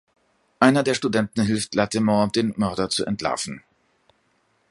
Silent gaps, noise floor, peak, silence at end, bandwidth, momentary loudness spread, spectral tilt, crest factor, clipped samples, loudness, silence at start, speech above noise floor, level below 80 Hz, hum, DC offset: none; -66 dBFS; 0 dBFS; 1.1 s; 11.5 kHz; 8 LU; -5 dB/octave; 24 dB; under 0.1%; -22 LUFS; 0.6 s; 45 dB; -54 dBFS; none; under 0.1%